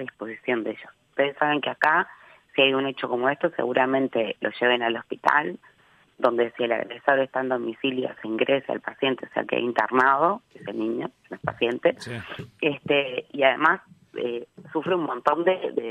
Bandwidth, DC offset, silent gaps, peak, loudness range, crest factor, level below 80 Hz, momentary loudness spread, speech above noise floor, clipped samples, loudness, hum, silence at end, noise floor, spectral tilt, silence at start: 10.5 kHz; under 0.1%; none; -4 dBFS; 2 LU; 22 dB; -70 dBFS; 12 LU; 33 dB; under 0.1%; -24 LUFS; none; 0 s; -58 dBFS; -6 dB/octave; 0 s